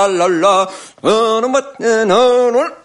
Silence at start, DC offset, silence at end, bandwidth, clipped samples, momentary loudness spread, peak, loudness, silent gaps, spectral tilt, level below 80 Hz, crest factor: 0 s; under 0.1%; 0.1 s; 11.5 kHz; under 0.1%; 6 LU; 0 dBFS; -13 LUFS; none; -3.5 dB/octave; -60 dBFS; 12 dB